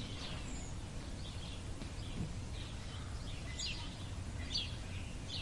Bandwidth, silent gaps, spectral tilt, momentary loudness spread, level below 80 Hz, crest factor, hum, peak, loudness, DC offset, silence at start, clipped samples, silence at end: 11.5 kHz; none; -4 dB/octave; 7 LU; -48 dBFS; 18 dB; none; -26 dBFS; -44 LUFS; under 0.1%; 0 s; under 0.1%; 0 s